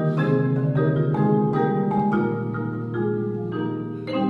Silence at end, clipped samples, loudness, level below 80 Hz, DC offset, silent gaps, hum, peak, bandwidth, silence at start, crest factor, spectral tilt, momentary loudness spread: 0 s; under 0.1%; -23 LUFS; -58 dBFS; under 0.1%; none; none; -8 dBFS; 4.7 kHz; 0 s; 14 dB; -10.5 dB/octave; 7 LU